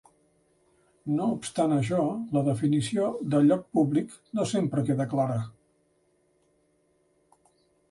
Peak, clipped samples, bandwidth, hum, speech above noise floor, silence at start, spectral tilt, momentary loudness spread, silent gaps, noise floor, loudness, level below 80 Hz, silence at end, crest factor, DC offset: -12 dBFS; under 0.1%; 11.5 kHz; none; 43 dB; 1.05 s; -7 dB/octave; 8 LU; none; -69 dBFS; -27 LUFS; -66 dBFS; 2.4 s; 16 dB; under 0.1%